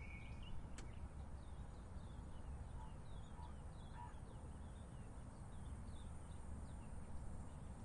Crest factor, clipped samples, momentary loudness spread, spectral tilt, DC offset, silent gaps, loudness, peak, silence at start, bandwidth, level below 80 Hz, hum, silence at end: 14 dB; under 0.1%; 2 LU; -6 dB/octave; under 0.1%; none; -55 LUFS; -38 dBFS; 0 s; 11 kHz; -56 dBFS; none; 0 s